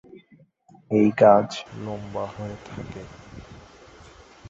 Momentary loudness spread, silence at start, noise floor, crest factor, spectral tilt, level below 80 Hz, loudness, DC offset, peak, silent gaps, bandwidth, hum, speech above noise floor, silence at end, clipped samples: 26 LU; 0.9 s; -56 dBFS; 22 dB; -7 dB/octave; -54 dBFS; -21 LUFS; under 0.1%; -4 dBFS; none; 7.8 kHz; none; 34 dB; 0.95 s; under 0.1%